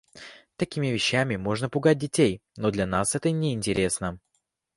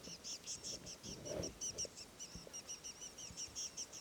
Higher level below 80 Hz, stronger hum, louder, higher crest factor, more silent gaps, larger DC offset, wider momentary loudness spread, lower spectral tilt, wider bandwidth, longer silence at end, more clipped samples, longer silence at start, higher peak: first, -52 dBFS vs -66 dBFS; neither; first, -26 LUFS vs -46 LUFS; about the same, 18 dB vs 18 dB; neither; neither; first, 10 LU vs 7 LU; first, -4.5 dB/octave vs -1.5 dB/octave; second, 11.5 kHz vs over 20 kHz; first, 0.6 s vs 0 s; neither; first, 0.15 s vs 0 s; first, -8 dBFS vs -32 dBFS